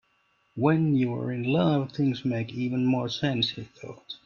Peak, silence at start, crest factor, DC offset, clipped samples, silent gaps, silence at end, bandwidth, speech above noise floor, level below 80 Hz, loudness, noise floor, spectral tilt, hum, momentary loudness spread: -8 dBFS; 0.55 s; 18 dB; under 0.1%; under 0.1%; none; 0.1 s; 7 kHz; 43 dB; -64 dBFS; -26 LUFS; -69 dBFS; -7.5 dB/octave; none; 16 LU